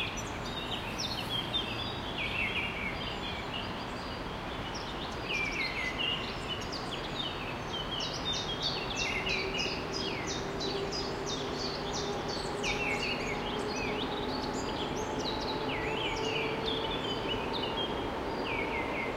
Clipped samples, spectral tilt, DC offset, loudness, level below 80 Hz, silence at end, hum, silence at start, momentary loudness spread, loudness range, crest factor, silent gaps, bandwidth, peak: under 0.1%; -3.5 dB/octave; under 0.1%; -34 LUFS; -48 dBFS; 0 s; none; 0 s; 5 LU; 2 LU; 16 dB; none; 16 kHz; -18 dBFS